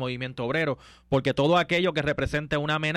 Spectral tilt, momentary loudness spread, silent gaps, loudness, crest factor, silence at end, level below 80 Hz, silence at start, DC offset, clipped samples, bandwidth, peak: -6 dB/octave; 9 LU; none; -25 LUFS; 14 dB; 0 s; -48 dBFS; 0 s; under 0.1%; under 0.1%; 12.5 kHz; -12 dBFS